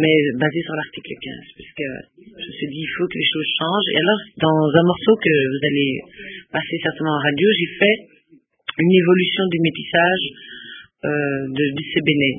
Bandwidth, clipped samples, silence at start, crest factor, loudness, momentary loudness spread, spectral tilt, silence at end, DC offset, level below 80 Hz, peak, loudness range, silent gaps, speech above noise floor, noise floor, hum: 3.8 kHz; under 0.1%; 0 s; 20 dB; -19 LUFS; 17 LU; -11 dB/octave; 0 s; under 0.1%; -58 dBFS; 0 dBFS; 5 LU; none; 36 dB; -55 dBFS; none